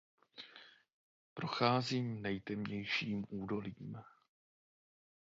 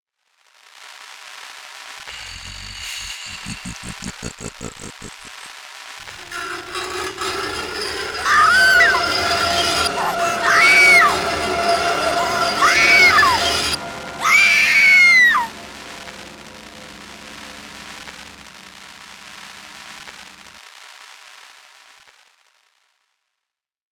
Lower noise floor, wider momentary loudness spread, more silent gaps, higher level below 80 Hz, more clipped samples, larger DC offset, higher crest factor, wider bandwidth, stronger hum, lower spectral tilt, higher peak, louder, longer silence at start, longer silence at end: second, -61 dBFS vs -84 dBFS; second, 21 LU vs 27 LU; first, 0.93-1.36 s vs none; second, -72 dBFS vs -48 dBFS; neither; neither; first, 26 dB vs 20 dB; second, 7.2 kHz vs over 20 kHz; neither; first, -4 dB/octave vs -1 dB/octave; second, -16 dBFS vs 0 dBFS; second, -38 LUFS vs -14 LUFS; second, 0.35 s vs 0.8 s; second, 1.15 s vs 3.75 s